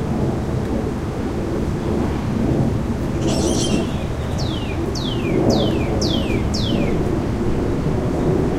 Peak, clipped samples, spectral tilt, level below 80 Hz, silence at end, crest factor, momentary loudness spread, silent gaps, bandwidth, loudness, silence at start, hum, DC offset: -4 dBFS; under 0.1%; -6 dB/octave; -28 dBFS; 0 s; 14 dB; 5 LU; none; 15.5 kHz; -21 LUFS; 0 s; none; under 0.1%